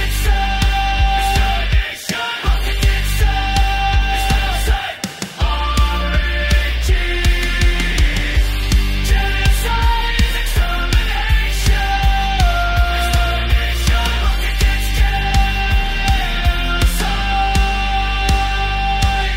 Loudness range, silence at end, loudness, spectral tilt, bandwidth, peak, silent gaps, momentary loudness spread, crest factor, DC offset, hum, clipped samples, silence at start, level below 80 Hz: 1 LU; 0 s; -17 LUFS; -4 dB/octave; 16 kHz; 0 dBFS; none; 2 LU; 14 dB; under 0.1%; none; under 0.1%; 0 s; -16 dBFS